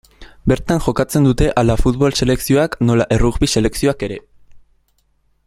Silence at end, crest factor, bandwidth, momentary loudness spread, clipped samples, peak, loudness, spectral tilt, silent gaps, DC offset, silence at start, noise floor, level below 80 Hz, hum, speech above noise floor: 0.9 s; 16 dB; 16 kHz; 4 LU; under 0.1%; 0 dBFS; -16 LUFS; -6 dB/octave; none; under 0.1%; 0.2 s; -61 dBFS; -28 dBFS; none; 46 dB